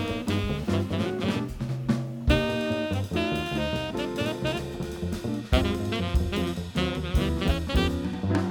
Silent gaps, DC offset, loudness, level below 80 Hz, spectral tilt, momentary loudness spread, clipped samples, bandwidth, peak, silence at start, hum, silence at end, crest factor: none; under 0.1%; -28 LUFS; -34 dBFS; -6 dB/octave; 5 LU; under 0.1%; 19 kHz; -6 dBFS; 0 s; none; 0 s; 20 dB